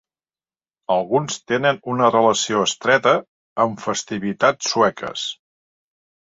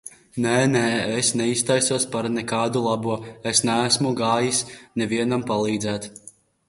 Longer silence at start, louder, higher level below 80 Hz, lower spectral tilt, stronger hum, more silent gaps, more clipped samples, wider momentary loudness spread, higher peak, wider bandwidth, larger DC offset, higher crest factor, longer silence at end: first, 0.9 s vs 0.05 s; first, -19 LUFS vs -22 LUFS; about the same, -62 dBFS vs -58 dBFS; about the same, -3.5 dB/octave vs -3.5 dB/octave; neither; first, 3.28-3.56 s vs none; neither; about the same, 11 LU vs 9 LU; first, -2 dBFS vs -6 dBFS; second, 8 kHz vs 11.5 kHz; neither; about the same, 20 dB vs 18 dB; first, 1 s vs 0.4 s